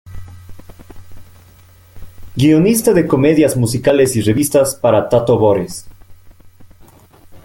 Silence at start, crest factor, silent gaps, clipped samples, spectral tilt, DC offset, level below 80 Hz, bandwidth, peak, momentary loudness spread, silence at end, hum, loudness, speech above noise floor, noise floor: 0.05 s; 14 dB; none; under 0.1%; -6 dB/octave; under 0.1%; -42 dBFS; 17 kHz; 0 dBFS; 16 LU; 0.05 s; none; -13 LUFS; 32 dB; -44 dBFS